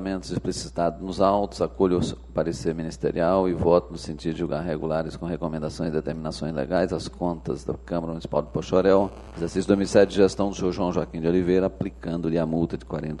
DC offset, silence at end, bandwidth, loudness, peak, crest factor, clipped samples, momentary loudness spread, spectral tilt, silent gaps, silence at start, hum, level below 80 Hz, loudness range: under 0.1%; 0 s; 11.5 kHz; -25 LUFS; -4 dBFS; 20 dB; under 0.1%; 10 LU; -6.5 dB/octave; none; 0 s; none; -42 dBFS; 5 LU